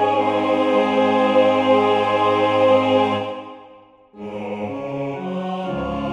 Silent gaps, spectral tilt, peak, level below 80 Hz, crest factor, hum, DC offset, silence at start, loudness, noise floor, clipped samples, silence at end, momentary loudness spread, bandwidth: none; -6.5 dB/octave; -4 dBFS; -50 dBFS; 16 dB; none; under 0.1%; 0 s; -19 LUFS; -47 dBFS; under 0.1%; 0 s; 14 LU; 8.6 kHz